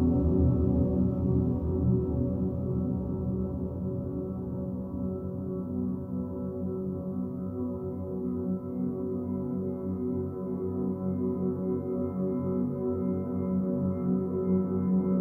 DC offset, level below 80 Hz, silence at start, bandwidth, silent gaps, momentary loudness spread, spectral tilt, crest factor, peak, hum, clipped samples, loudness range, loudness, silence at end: under 0.1%; -42 dBFS; 0 s; 2.2 kHz; none; 8 LU; -13.5 dB/octave; 16 dB; -14 dBFS; none; under 0.1%; 5 LU; -31 LUFS; 0 s